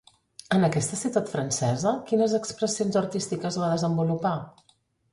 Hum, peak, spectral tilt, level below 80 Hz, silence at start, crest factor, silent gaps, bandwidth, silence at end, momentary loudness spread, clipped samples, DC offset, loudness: none; -8 dBFS; -5.5 dB/octave; -62 dBFS; 0.5 s; 18 dB; none; 11.5 kHz; 0.65 s; 6 LU; under 0.1%; under 0.1%; -26 LUFS